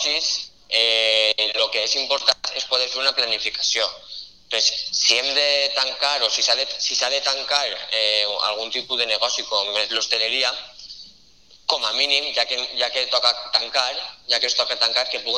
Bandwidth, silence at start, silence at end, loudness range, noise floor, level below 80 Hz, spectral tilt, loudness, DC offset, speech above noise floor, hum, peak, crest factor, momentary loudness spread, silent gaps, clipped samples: 12.5 kHz; 0 s; 0 s; 3 LU; -53 dBFS; -62 dBFS; 2 dB/octave; -19 LUFS; 0.2%; 31 dB; none; 0 dBFS; 22 dB; 7 LU; none; under 0.1%